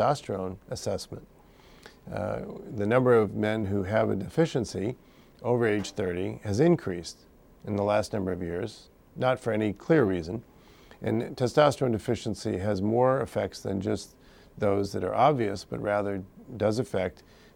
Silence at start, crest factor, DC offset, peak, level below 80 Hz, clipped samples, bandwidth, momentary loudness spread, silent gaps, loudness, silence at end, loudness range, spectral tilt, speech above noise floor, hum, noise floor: 0 s; 20 dB; under 0.1%; -8 dBFS; -58 dBFS; under 0.1%; 16.5 kHz; 13 LU; none; -28 LUFS; 0.4 s; 2 LU; -6.5 dB/octave; 27 dB; none; -54 dBFS